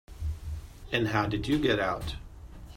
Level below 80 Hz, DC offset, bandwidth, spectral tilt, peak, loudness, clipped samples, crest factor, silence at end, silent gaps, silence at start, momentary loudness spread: -42 dBFS; under 0.1%; 16 kHz; -6 dB/octave; -12 dBFS; -30 LUFS; under 0.1%; 20 dB; 0 s; none; 0.1 s; 17 LU